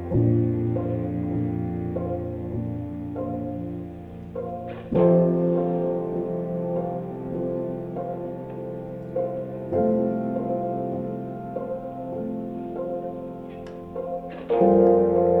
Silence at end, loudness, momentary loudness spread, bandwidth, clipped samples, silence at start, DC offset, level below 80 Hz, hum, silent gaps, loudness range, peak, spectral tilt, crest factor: 0 s; -26 LUFS; 15 LU; 3.9 kHz; under 0.1%; 0 s; under 0.1%; -50 dBFS; none; none; 7 LU; -6 dBFS; -11.5 dB/octave; 20 dB